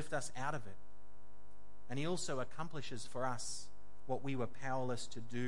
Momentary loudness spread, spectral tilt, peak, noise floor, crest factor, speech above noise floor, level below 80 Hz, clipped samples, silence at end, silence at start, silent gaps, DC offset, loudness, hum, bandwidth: 8 LU; -4.5 dB/octave; -24 dBFS; -64 dBFS; 18 dB; 22 dB; -68 dBFS; under 0.1%; 0 s; 0 s; none; 1%; -43 LUFS; 50 Hz at -65 dBFS; 11.5 kHz